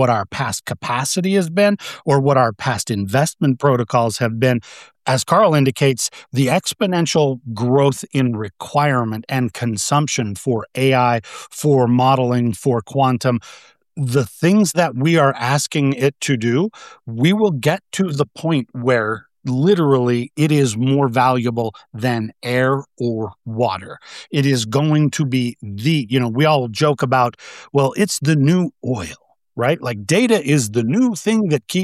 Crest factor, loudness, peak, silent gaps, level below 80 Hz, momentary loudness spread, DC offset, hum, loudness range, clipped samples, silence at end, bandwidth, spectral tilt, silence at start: 14 dB; -18 LUFS; -2 dBFS; none; -58 dBFS; 8 LU; under 0.1%; none; 2 LU; under 0.1%; 0 s; 14.5 kHz; -5.5 dB/octave; 0 s